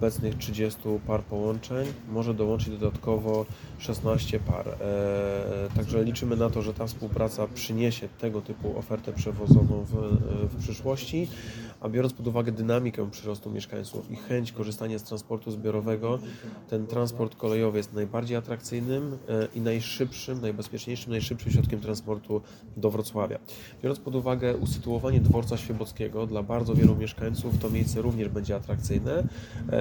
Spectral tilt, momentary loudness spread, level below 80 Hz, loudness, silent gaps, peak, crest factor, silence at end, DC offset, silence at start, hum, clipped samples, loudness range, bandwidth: -7 dB/octave; 8 LU; -44 dBFS; -29 LUFS; none; -4 dBFS; 24 dB; 0 s; under 0.1%; 0 s; none; under 0.1%; 5 LU; 19 kHz